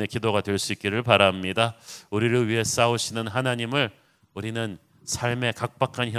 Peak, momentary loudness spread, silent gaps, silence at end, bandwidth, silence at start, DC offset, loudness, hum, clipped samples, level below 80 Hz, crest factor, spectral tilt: 0 dBFS; 11 LU; none; 0 s; 16 kHz; 0 s; under 0.1%; -24 LUFS; none; under 0.1%; -54 dBFS; 24 dB; -4 dB/octave